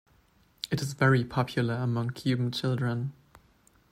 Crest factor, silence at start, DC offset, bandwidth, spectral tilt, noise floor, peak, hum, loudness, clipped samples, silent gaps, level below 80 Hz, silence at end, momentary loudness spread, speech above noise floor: 20 dB; 0.65 s; under 0.1%; 15 kHz; -6.5 dB/octave; -64 dBFS; -10 dBFS; none; -29 LUFS; under 0.1%; none; -62 dBFS; 0.8 s; 10 LU; 36 dB